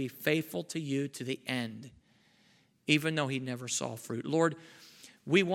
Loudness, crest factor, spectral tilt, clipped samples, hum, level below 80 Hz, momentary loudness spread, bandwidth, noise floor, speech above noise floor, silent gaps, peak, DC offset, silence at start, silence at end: -33 LUFS; 22 dB; -4.5 dB/octave; under 0.1%; none; -78 dBFS; 21 LU; 17 kHz; -67 dBFS; 35 dB; none; -12 dBFS; under 0.1%; 0 s; 0 s